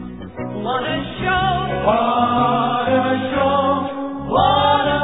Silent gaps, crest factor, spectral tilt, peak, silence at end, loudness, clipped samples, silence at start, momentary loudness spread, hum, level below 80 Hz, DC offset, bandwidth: none; 14 dB; -9 dB/octave; -4 dBFS; 0 s; -18 LUFS; under 0.1%; 0 s; 10 LU; none; -40 dBFS; 0.4%; 4 kHz